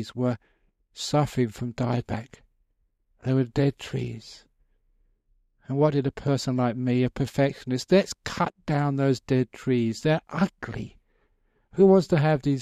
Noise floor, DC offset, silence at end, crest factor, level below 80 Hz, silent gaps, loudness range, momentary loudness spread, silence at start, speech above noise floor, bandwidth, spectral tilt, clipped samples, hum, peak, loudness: -71 dBFS; under 0.1%; 0 s; 18 dB; -54 dBFS; none; 6 LU; 13 LU; 0 s; 46 dB; 13.5 kHz; -7 dB/octave; under 0.1%; none; -6 dBFS; -25 LUFS